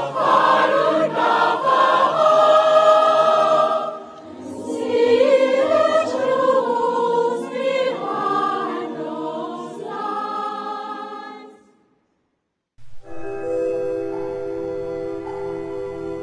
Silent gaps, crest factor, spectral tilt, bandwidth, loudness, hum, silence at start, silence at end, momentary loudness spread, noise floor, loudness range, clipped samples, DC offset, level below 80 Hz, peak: none; 16 dB; -4.5 dB/octave; 10.5 kHz; -19 LUFS; none; 0 s; 0 s; 16 LU; -74 dBFS; 15 LU; under 0.1%; under 0.1%; -58 dBFS; -4 dBFS